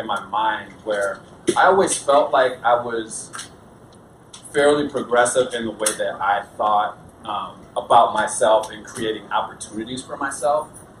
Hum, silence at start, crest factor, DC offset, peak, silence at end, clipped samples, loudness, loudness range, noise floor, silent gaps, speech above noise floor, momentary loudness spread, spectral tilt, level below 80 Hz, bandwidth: none; 0 s; 20 dB; under 0.1%; -2 dBFS; 0.2 s; under 0.1%; -20 LUFS; 2 LU; -46 dBFS; none; 26 dB; 14 LU; -3 dB/octave; -56 dBFS; 14.5 kHz